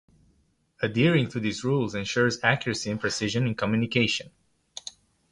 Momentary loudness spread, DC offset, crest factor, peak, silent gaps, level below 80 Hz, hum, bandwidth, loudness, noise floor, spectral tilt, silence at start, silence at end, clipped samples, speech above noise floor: 17 LU; under 0.1%; 22 dB; -6 dBFS; none; -58 dBFS; none; 11.5 kHz; -26 LUFS; -67 dBFS; -5 dB/octave; 0.8 s; 0.4 s; under 0.1%; 41 dB